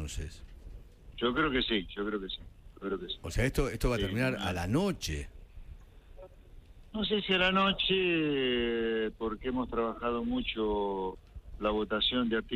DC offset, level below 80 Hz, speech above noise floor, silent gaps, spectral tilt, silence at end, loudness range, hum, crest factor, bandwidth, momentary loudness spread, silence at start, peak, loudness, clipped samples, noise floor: under 0.1%; -44 dBFS; 22 dB; none; -5 dB/octave; 0 s; 5 LU; none; 18 dB; 15.5 kHz; 15 LU; 0 s; -14 dBFS; -31 LUFS; under 0.1%; -53 dBFS